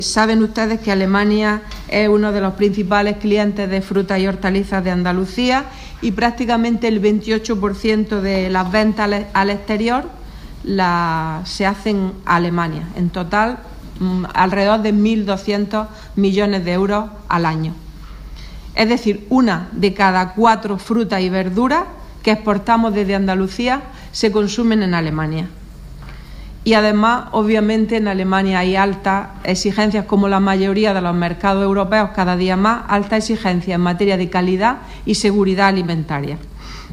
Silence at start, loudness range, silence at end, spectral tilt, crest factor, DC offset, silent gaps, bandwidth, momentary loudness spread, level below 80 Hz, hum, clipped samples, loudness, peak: 0 s; 3 LU; 0 s; -6 dB/octave; 16 dB; under 0.1%; none; 11.5 kHz; 9 LU; -36 dBFS; none; under 0.1%; -17 LUFS; 0 dBFS